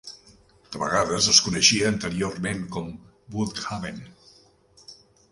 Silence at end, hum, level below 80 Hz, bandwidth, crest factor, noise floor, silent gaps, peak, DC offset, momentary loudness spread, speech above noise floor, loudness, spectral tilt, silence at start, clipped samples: 0.4 s; none; -52 dBFS; 11.5 kHz; 26 dB; -57 dBFS; none; -2 dBFS; under 0.1%; 21 LU; 32 dB; -22 LUFS; -2.5 dB/octave; 0.05 s; under 0.1%